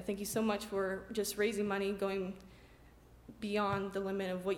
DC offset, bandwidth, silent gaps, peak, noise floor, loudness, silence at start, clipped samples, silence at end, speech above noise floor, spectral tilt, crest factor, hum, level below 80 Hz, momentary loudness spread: under 0.1%; 17 kHz; none; -22 dBFS; -60 dBFS; -36 LUFS; 0 s; under 0.1%; 0 s; 24 dB; -4.5 dB/octave; 16 dB; none; -62 dBFS; 5 LU